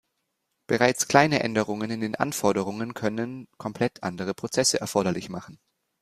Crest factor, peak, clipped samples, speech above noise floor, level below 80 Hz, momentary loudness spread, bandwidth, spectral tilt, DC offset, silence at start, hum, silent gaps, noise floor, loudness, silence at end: 24 dB; -2 dBFS; under 0.1%; 52 dB; -62 dBFS; 13 LU; 15.5 kHz; -4 dB/octave; under 0.1%; 0.7 s; none; none; -78 dBFS; -25 LUFS; 0.45 s